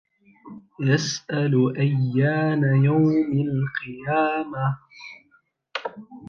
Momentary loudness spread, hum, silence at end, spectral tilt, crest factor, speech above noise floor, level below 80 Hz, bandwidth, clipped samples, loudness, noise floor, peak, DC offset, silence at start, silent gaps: 15 LU; none; 0 s; -6.5 dB/octave; 16 dB; 41 dB; -64 dBFS; 7 kHz; under 0.1%; -22 LUFS; -63 dBFS; -8 dBFS; under 0.1%; 0.45 s; none